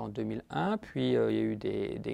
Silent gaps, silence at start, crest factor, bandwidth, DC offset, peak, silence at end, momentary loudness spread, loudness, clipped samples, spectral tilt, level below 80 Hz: none; 0 s; 14 dB; 11 kHz; under 0.1%; -18 dBFS; 0 s; 7 LU; -32 LUFS; under 0.1%; -8 dB/octave; -60 dBFS